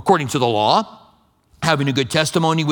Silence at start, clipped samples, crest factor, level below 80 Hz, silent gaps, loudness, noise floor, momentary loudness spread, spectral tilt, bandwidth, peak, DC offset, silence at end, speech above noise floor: 0 s; under 0.1%; 18 dB; -54 dBFS; none; -18 LUFS; -56 dBFS; 4 LU; -5 dB/octave; 19 kHz; 0 dBFS; under 0.1%; 0 s; 38 dB